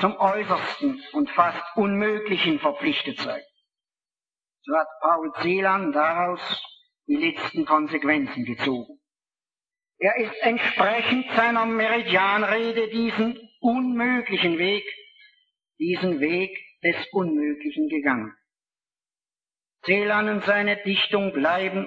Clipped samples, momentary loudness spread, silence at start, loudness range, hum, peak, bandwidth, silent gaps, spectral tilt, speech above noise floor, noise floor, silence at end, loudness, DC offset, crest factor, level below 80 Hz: under 0.1%; 7 LU; 0 s; 4 LU; none; -4 dBFS; 7.6 kHz; none; -6.5 dB/octave; over 67 dB; under -90 dBFS; 0 s; -23 LUFS; under 0.1%; 20 dB; -66 dBFS